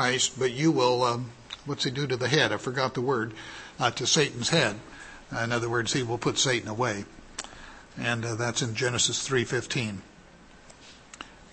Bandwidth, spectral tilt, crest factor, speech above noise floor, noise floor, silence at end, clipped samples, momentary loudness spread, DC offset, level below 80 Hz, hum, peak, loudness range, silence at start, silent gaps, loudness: 8.8 kHz; -3.5 dB/octave; 22 dB; 25 dB; -52 dBFS; 0.05 s; under 0.1%; 18 LU; under 0.1%; -56 dBFS; none; -8 dBFS; 3 LU; 0 s; none; -27 LUFS